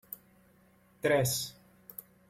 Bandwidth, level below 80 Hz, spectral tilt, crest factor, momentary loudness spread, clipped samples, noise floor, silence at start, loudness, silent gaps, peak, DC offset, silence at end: 16.5 kHz; -64 dBFS; -3.5 dB/octave; 20 dB; 20 LU; under 0.1%; -64 dBFS; 0.1 s; -31 LUFS; none; -16 dBFS; under 0.1%; 0.8 s